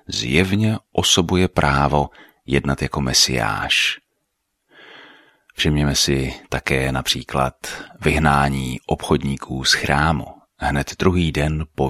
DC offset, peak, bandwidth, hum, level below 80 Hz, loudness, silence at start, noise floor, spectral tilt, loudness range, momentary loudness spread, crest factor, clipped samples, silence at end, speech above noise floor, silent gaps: under 0.1%; -2 dBFS; 15 kHz; none; -34 dBFS; -19 LUFS; 0.1 s; -74 dBFS; -4 dB/octave; 3 LU; 10 LU; 18 dB; under 0.1%; 0 s; 54 dB; none